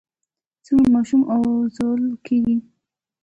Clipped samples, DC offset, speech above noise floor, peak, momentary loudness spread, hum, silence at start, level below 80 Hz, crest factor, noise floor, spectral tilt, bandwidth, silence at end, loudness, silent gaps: under 0.1%; under 0.1%; 64 dB; -8 dBFS; 6 LU; none; 0.7 s; -50 dBFS; 12 dB; -82 dBFS; -7.5 dB/octave; 8 kHz; 0.6 s; -19 LUFS; none